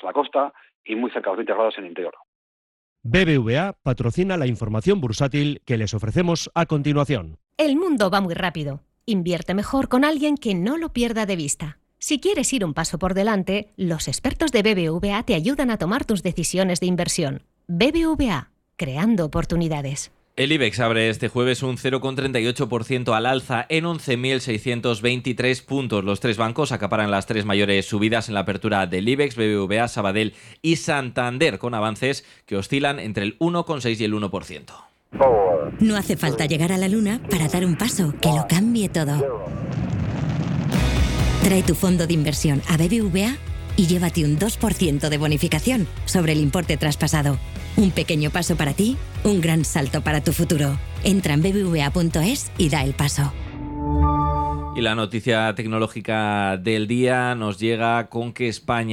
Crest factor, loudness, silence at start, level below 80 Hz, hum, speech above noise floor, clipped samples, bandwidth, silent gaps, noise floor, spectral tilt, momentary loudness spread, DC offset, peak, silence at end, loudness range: 16 dB; -22 LUFS; 0.05 s; -36 dBFS; none; over 69 dB; under 0.1%; 17.5 kHz; 0.75-0.84 s, 2.28-2.96 s; under -90 dBFS; -5 dB/octave; 6 LU; under 0.1%; -6 dBFS; 0 s; 2 LU